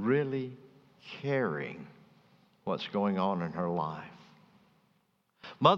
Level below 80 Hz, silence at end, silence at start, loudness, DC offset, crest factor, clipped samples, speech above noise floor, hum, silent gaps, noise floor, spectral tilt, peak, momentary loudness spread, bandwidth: -76 dBFS; 0 s; 0 s; -33 LUFS; under 0.1%; 26 dB; under 0.1%; 40 dB; none; none; -73 dBFS; -7.5 dB/octave; -8 dBFS; 21 LU; 7.2 kHz